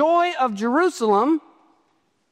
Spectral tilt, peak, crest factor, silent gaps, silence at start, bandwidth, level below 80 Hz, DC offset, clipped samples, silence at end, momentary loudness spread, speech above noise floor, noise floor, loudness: -5 dB/octave; -6 dBFS; 14 dB; none; 0 s; 14 kHz; -78 dBFS; under 0.1%; under 0.1%; 0.9 s; 4 LU; 47 dB; -67 dBFS; -20 LUFS